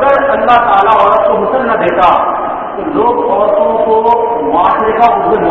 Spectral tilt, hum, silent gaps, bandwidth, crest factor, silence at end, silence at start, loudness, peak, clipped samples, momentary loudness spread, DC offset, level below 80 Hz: -7 dB/octave; none; none; 7 kHz; 10 dB; 0 s; 0 s; -10 LUFS; 0 dBFS; 0.4%; 5 LU; under 0.1%; -40 dBFS